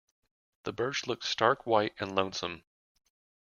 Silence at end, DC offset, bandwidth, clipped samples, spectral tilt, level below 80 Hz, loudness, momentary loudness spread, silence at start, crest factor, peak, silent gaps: 0.9 s; under 0.1%; 7.4 kHz; under 0.1%; -3.5 dB/octave; -70 dBFS; -31 LUFS; 13 LU; 0.65 s; 24 dB; -8 dBFS; none